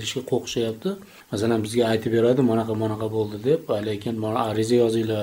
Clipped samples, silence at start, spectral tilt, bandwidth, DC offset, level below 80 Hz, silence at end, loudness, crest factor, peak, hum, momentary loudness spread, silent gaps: under 0.1%; 0 s; -6 dB/octave; 16 kHz; under 0.1%; -58 dBFS; 0 s; -23 LUFS; 16 dB; -8 dBFS; none; 7 LU; none